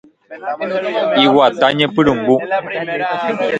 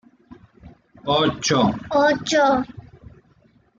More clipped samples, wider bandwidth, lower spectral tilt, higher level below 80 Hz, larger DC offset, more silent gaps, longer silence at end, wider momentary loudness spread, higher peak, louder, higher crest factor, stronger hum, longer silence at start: neither; about the same, 8.8 kHz vs 9.2 kHz; first, -6 dB/octave vs -4 dB/octave; about the same, -52 dBFS vs -52 dBFS; neither; neither; second, 0 s vs 1 s; first, 10 LU vs 7 LU; first, 0 dBFS vs -6 dBFS; first, -15 LUFS vs -19 LUFS; about the same, 16 dB vs 16 dB; neither; about the same, 0.3 s vs 0.3 s